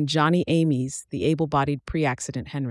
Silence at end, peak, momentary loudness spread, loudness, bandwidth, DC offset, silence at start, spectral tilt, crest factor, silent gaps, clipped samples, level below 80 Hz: 0 s; -8 dBFS; 9 LU; -24 LUFS; 12 kHz; under 0.1%; 0 s; -6 dB/octave; 16 dB; none; under 0.1%; -48 dBFS